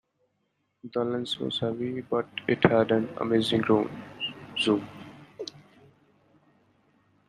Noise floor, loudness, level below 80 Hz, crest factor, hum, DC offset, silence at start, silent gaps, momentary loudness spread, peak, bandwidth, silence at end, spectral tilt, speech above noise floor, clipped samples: -76 dBFS; -27 LUFS; -64 dBFS; 26 dB; none; under 0.1%; 0.85 s; none; 18 LU; -2 dBFS; 12 kHz; 1.8 s; -6 dB/octave; 49 dB; under 0.1%